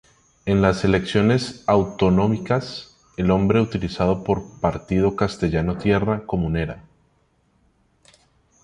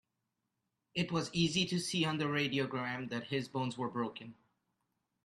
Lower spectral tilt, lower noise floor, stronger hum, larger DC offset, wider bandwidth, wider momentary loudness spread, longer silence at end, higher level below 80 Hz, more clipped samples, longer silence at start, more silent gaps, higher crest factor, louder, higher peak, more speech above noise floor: first, -7 dB/octave vs -4.5 dB/octave; second, -63 dBFS vs -86 dBFS; neither; neither; second, 10.5 kHz vs 12.5 kHz; about the same, 7 LU vs 8 LU; first, 1.85 s vs 0.9 s; first, -40 dBFS vs -72 dBFS; neither; second, 0.45 s vs 0.95 s; neither; about the same, 18 dB vs 18 dB; first, -21 LUFS vs -35 LUFS; first, -4 dBFS vs -20 dBFS; second, 43 dB vs 50 dB